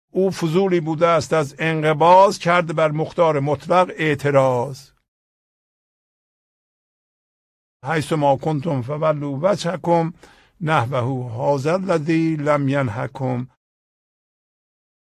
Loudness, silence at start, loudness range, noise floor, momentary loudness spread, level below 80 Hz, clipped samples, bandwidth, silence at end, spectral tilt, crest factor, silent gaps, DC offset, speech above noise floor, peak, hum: -19 LUFS; 0.15 s; 8 LU; under -90 dBFS; 8 LU; -58 dBFS; under 0.1%; 13.5 kHz; 1.75 s; -6.5 dB/octave; 18 dB; 5.08-7.80 s; under 0.1%; over 71 dB; -2 dBFS; none